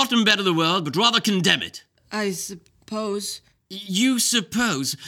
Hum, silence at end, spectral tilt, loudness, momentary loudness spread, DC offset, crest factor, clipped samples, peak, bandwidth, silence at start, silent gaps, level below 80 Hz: none; 0 s; -3 dB/octave; -21 LUFS; 15 LU; under 0.1%; 22 dB; under 0.1%; -2 dBFS; 17.5 kHz; 0 s; none; -64 dBFS